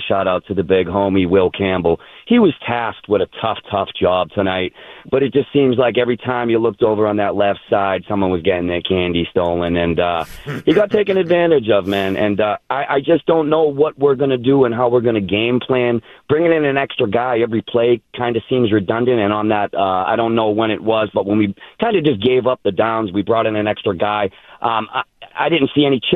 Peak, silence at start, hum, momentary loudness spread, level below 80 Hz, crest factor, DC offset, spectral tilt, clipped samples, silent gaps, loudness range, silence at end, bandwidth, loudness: -2 dBFS; 0 s; none; 6 LU; -48 dBFS; 14 dB; under 0.1%; -8 dB/octave; under 0.1%; none; 2 LU; 0 s; 12 kHz; -17 LUFS